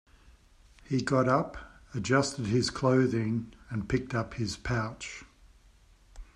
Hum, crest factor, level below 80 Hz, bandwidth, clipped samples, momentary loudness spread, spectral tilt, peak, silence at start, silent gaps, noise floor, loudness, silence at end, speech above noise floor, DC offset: none; 22 dB; -52 dBFS; 10.5 kHz; under 0.1%; 14 LU; -5.5 dB/octave; -10 dBFS; 0.9 s; none; -59 dBFS; -30 LUFS; 0.1 s; 30 dB; under 0.1%